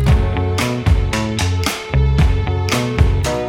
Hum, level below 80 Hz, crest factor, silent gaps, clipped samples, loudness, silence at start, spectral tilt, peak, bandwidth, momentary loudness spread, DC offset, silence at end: none; -20 dBFS; 14 dB; none; under 0.1%; -17 LUFS; 0 s; -5.5 dB/octave; 0 dBFS; 17 kHz; 3 LU; under 0.1%; 0 s